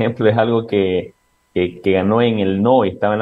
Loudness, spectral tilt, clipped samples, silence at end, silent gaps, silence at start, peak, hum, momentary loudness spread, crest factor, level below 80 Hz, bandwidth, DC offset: -17 LUFS; -9 dB/octave; under 0.1%; 0 s; none; 0 s; -2 dBFS; none; 7 LU; 16 dB; -58 dBFS; 5.2 kHz; under 0.1%